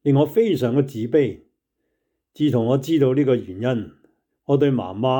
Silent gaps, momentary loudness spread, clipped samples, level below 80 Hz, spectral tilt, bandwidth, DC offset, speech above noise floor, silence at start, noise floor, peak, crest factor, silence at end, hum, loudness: none; 7 LU; under 0.1%; -64 dBFS; -8 dB/octave; 19.5 kHz; under 0.1%; 56 dB; 0.05 s; -75 dBFS; -6 dBFS; 14 dB; 0 s; none; -20 LUFS